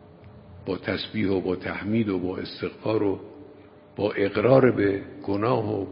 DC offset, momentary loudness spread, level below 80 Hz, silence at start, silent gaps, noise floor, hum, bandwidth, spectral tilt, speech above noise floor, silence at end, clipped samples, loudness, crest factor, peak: under 0.1%; 14 LU; -52 dBFS; 0.25 s; none; -49 dBFS; none; 5.4 kHz; -11.5 dB/octave; 25 dB; 0 s; under 0.1%; -25 LUFS; 20 dB; -4 dBFS